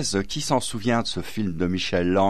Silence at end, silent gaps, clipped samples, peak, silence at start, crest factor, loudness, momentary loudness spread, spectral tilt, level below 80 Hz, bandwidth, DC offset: 0 s; none; under 0.1%; -6 dBFS; 0 s; 16 dB; -25 LUFS; 5 LU; -4.5 dB/octave; -46 dBFS; 14.5 kHz; 2%